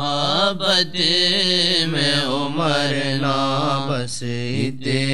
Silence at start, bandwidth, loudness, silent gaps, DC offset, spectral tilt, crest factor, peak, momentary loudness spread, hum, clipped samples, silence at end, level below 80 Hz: 0 s; 13.5 kHz; -18 LUFS; none; 3%; -4 dB/octave; 16 dB; -4 dBFS; 8 LU; none; under 0.1%; 0 s; -62 dBFS